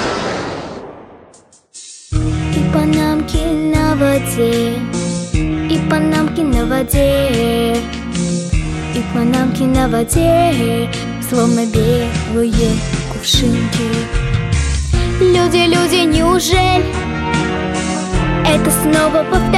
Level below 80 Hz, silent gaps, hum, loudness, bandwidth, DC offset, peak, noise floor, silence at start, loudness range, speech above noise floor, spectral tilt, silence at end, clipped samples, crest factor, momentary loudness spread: -24 dBFS; none; none; -15 LUFS; 16 kHz; under 0.1%; 0 dBFS; -46 dBFS; 0 s; 3 LU; 33 dB; -5 dB/octave; 0 s; under 0.1%; 14 dB; 8 LU